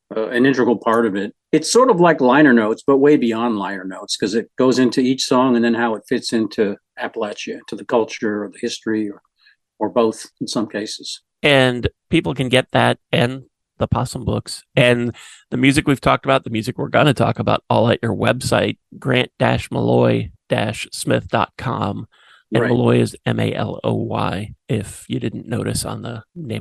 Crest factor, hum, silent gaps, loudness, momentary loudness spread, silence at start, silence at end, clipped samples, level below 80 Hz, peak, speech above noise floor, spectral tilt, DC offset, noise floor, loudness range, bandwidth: 18 dB; none; none; -18 LUFS; 12 LU; 0.1 s; 0 s; under 0.1%; -46 dBFS; 0 dBFS; 40 dB; -5.5 dB/octave; under 0.1%; -57 dBFS; 7 LU; 12.5 kHz